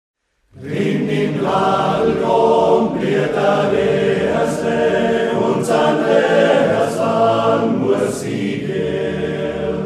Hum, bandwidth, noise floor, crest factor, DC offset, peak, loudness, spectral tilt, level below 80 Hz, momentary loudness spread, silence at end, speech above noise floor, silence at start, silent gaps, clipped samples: none; 13.5 kHz; -41 dBFS; 14 dB; under 0.1%; -2 dBFS; -16 LUFS; -6 dB/octave; -48 dBFS; 8 LU; 0 s; 26 dB; 0.55 s; none; under 0.1%